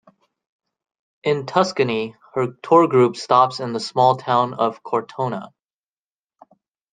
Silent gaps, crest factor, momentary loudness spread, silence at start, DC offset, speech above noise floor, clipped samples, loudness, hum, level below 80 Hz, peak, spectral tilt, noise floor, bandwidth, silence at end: none; 20 dB; 10 LU; 1.25 s; under 0.1%; over 71 dB; under 0.1%; -19 LUFS; none; -68 dBFS; -2 dBFS; -6 dB/octave; under -90 dBFS; 9.4 kHz; 1.45 s